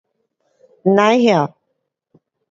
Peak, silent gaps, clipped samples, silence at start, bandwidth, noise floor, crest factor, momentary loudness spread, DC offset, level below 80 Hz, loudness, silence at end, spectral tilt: 0 dBFS; none; under 0.1%; 0.85 s; 7.6 kHz; -73 dBFS; 18 dB; 10 LU; under 0.1%; -66 dBFS; -15 LUFS; 1.05 s; -6 dB/octave